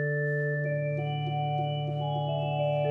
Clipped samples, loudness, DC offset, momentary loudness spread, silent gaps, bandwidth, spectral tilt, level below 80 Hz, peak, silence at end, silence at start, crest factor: under 0.1%; -30 LUFS; under 0.1%; 2 LU; none; 3.5 kHz; -9 dB/octave; -72 dBFS; -16 dBFS; 0 s; 0 s; 12 dB